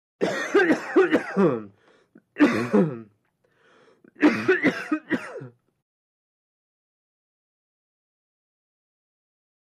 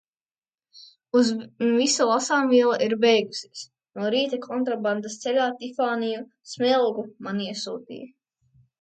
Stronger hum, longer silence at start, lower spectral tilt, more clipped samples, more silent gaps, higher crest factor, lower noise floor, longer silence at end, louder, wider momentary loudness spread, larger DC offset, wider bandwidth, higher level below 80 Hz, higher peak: neither; second, 0.2 s vs 0.75 s; first, -6.5 dB/octave vs -3.5 dB/octave; neither; neither; about the same, 20 dB vs 18 dB; second, -67 dBFS vs under -90 dBFS; first, 4.1 s vs 0.75 s; about the same, -23 LUFS vs -24 LUFS; second, 10 LU vs 15 LU; neither; first, 12.5 kHz vs 9.4 kHz; first, -70 dBFS vs -76 dBFS; about the same, -6 dBFS vs -8 dBFS